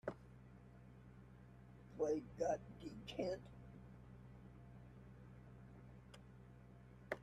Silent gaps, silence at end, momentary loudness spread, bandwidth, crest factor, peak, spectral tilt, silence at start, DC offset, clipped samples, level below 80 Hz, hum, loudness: none; 0 s; 20 LU; 13.5 kHz; 24 dB; -26 dBFS; -6 dB/octave; 0.05 s; under 0.1%; under 0.1%; -68 dBFS; none; -47 LUFS